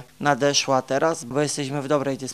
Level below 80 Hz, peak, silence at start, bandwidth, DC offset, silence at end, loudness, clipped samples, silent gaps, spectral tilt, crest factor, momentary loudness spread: -64 dBFS; -4 dBFS; 0 s; 15 kHz; 0.2%; 0 s; -22 LUFS; under 0.1%; none; -3.5 dB/octave; 20 dB; 5 LU